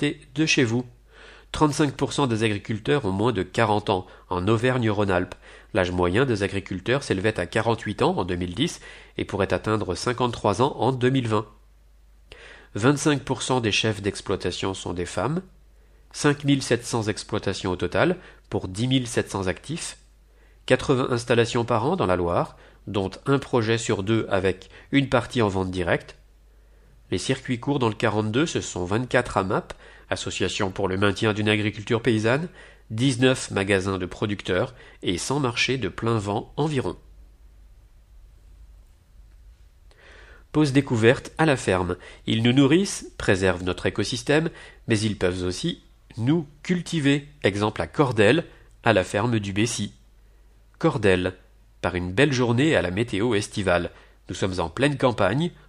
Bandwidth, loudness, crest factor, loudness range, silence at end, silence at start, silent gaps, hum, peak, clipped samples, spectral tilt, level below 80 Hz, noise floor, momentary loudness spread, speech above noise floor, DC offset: 13 kHz; -24 LUFS; 22 dB; 3 LU; 0.15 s; 0 s; none; none; -2 dBFS; under 0.1%; -5.5 dB/octave; -48 dBFS; -53 dBFS; 9 LU; 30 dB; under 0.1%